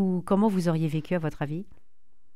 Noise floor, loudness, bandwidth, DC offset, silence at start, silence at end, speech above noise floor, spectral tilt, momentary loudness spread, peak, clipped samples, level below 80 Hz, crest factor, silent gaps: -72 dBFS; -27 LUFS; 13.5 kHz; 0.8%; 0 s; 0.7 s; 46 dB; -8 dB/octave; 10 LU; -12 dBFS; under 0.1%; -54 dBFS; 16 dB; none